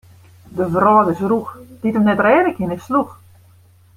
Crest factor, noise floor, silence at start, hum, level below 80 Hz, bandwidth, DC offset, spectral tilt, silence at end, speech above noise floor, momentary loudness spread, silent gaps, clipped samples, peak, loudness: 16 dB; -49 dBFS; 0.5 s; none; -54 dBFS; 15.5 kHz; under 0.1%; -8 dB/octave; 0.85 s; 33 dB; 12 LU; none; under 0.1%; -2 dBFS; -16 LUFS